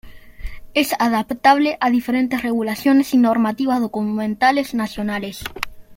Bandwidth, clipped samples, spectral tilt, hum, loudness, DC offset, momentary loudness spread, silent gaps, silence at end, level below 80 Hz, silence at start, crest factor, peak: 16.5 kHz; under 0.1%; -4.5 dB/octave; none; -18 LUFS; under 0.1%; 13 LU; none; 0 s; -44 dBFS; 0.05 s; 18 dB; 0 dBFS